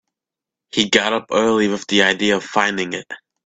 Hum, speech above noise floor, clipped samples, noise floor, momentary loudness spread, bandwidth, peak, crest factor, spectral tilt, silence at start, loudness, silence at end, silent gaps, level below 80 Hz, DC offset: none; 69 dB; under 0.1%; -86 dBFS; 9 LU; 9.2 kHz; 0 dBFS; 20 dB; -3 dB/octave; 0.75 s; -17 LUFS; 0.3 s; none; -58 dBFS; under 0.1%